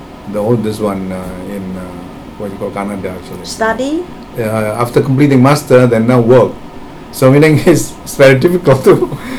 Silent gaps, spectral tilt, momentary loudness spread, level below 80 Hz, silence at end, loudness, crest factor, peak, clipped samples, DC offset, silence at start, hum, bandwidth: none; -6.5 dB/octave; 18 LU; -36 dBFS; 0 s; -11 LUFS; 12 dB; 0 dBFS; 2%; under 0.1%; 0 s; none; 18.5 kHz